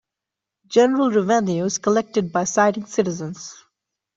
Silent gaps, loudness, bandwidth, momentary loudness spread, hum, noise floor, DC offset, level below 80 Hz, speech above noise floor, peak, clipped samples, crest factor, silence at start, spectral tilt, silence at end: none; -20 LUFS; 8 kHz; 13 LU; none; -86 dBFS; under 0.1%; -62 dBFS; 66 dB; -4 dBFS; under 0.1%; 18 dB; 0.7 s; -5 dB/octave; 0.6 s